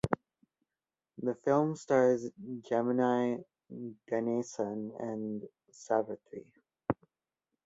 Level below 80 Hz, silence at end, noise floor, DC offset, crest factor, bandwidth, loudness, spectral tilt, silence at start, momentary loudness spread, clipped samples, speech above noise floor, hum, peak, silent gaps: -66 dBFS; 0.75 s; under -90 dBFS; under 0.1%; 24 dB; 10.5 kHz; -33 LUFS; -7 dB/octave; 0.05 s; 16 LU; under 0.1%; over 58 dB; none; -10 dBFS; none